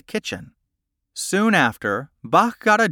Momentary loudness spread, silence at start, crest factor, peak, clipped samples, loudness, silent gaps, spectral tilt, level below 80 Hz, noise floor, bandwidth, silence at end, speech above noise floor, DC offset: 14 LU; 0.1 s; 18 dB; -4 dBFS; under 0.1%; -20 LUFS; none; -4 dB/octave; -60 dBFS; -78 dBFS; 18 kHz; 0 s; 58 dB; under 0.1%